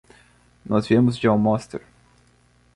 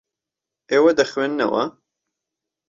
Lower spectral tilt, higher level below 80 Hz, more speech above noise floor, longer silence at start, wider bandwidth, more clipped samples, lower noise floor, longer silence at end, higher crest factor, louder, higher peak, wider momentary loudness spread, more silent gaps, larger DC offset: first, -7.5 dB/octave vs -4.5 dB/octave; first, -54 dBFS vs -64 dBFS; second, 39 dB vs 68 dB; about the same, 0.7 s vs 0.7 s; first, 11.5 kHz vs 7.6 kHz; neither; second, -58 dBFS vs -86 dBFS; about the same, 0.95 s vs 1 s; about the same, 18 dB vs 18 dB; about the same, -20 LUFS vs -19 LUFS; about the same, -6 dBFS vs -4 dBFS; first, 16 LU vs 8 LU; neither; neither